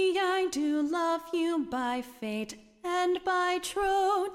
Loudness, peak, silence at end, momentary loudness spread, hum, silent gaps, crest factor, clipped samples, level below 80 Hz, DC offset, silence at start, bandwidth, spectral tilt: -30 LUFS; -18 dBFS; 0 s; 9 LU; none; none; 12 dB; under 0.1%; -60 dBFS; under 0.1%; 0 s; 15.5 kHz; -3 dB/octave